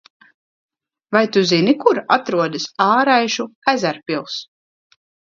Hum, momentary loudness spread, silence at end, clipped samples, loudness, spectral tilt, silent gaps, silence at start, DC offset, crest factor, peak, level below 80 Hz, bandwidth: none; 10 LU; 0.95 s; under 0.1%; -17 LUFS; -4.5 dB/octave; 3.55-3.62 s; 1.1 s; under 0.1%; 18 dB; 0 dBFS; -66 dBFS; 7.6 kHz